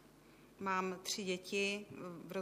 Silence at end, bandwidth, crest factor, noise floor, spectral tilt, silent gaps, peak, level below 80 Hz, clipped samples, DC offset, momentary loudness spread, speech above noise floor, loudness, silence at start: 0 s; 15.5 kHz; 18 dB; -63 dBFS; -3.5 dB/octave; none; -24 dBFS; -78 dBFS; under 0.1%; under 0.1%; 9 LU; 22 dB; -40 LUFS; 0 s